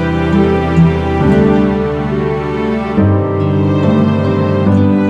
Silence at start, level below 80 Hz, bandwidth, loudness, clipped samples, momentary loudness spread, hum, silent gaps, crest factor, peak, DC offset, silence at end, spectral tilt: 0 s; -28 dBFS; 7.8 kHz; -12 LUFS; under 0.1%; 5 LU; none; none; 12 dB; 0 dBFS; under 0.1%; 0 s; -9 dB/octave